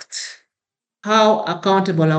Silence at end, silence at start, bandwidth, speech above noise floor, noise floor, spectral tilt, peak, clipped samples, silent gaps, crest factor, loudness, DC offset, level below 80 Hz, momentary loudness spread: 0 s; 0 s; 9 kHz; 72 dB; -88 dBFS; -5.5 dB/octave; -2 dBFS; under 0.1%; none; 16 dB; -16 LUFS; under 0.1%; -76 dBFS; 17 LU